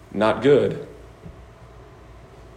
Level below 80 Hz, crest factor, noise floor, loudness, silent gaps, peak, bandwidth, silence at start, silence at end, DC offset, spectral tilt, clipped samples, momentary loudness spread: -50 dBFS; 18 dB; -45 dBFS; -19 LUFS; none; -6 dBFS; 9.8 kHz; 0.1 s; 0.45 s; under 0.1%; -7 dB/octave; under 0.1%; 26 LU